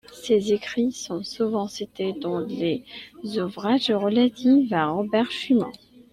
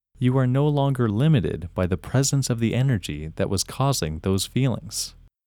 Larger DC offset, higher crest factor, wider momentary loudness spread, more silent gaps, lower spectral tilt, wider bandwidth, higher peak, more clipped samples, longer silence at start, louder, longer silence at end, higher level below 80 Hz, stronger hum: neither; about the same, 14 dB vs 16 dB; first, 12 LU vs 8 LU; neither; about the same, -5.5 dB/octave vs -5.5 dB/octave; second, 13 kHz vs 17.5 kHz; about the same, -10 dBFS vs -8 dBFS; neither; about the same, 0.1 s vs 0.2 s; about the same, -24 LUFS vs -23 LUFS; about the same, 0.35 s vs 0.35 s; second, -64 dBFS vs -44 dBFS; neither